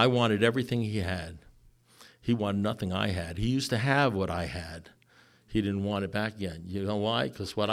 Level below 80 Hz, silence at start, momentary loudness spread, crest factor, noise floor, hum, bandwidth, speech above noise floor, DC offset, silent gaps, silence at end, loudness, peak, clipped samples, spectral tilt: -52 dBFS; 0 s; 12 LU; 22 dB; -61 dBFS; none; 15 kHz; 32 dB; under 0.1%; none; 0 s; -30 LUFS; -8 dBFS; under 0.1%; -6 dB/octave